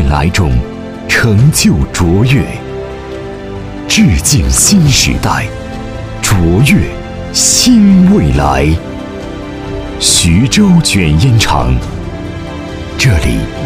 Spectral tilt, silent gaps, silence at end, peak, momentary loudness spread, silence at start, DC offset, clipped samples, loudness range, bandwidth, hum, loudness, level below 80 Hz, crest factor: -4.5 dB/octave; none; 0 s; 0 dBFS; 16 LU; 0 s; under 0.1%; 0.1%; 2 LU; 16.5 kHz; none; -9 LUFS; -20 dBFS; 10 dB